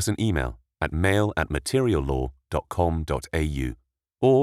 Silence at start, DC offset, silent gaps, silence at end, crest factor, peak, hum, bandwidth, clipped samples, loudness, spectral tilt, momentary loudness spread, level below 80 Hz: 0 s; under 0.1%; none; 0 s; 16 dB; -8 dBFS; none; 14.5 kHz; under 0.1%; -26 LUFS; -6 dB/octave; 9 LU; -36 dBFS